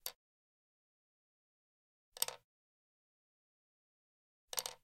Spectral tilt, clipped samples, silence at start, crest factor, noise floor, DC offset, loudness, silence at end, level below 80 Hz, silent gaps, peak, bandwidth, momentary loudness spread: 2 dB/octave; under 0.1%; 0.05 s; 38 dB; under -90 dBFS; under 0.1%; -42 LUFS; 0.1 s; -86 dBFS; 0.15-2.12 s, 2.44-4.48 s; -14 dBFS; 16 kHz; 19 LU